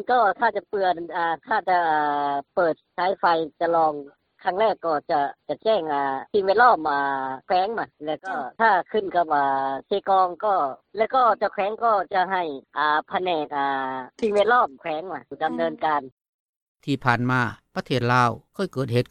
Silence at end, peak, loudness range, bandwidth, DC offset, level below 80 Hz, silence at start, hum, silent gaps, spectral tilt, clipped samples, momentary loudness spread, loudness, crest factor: 0.05 s; -4 dBFS; 3 LU; 10 kHz; under 0.1%; -62 dBFS; 0 s; none; 16.12-16.75 s; -6.5 dB/octave; under 0.1%; 9 LU; -23 LUFS; 18 dB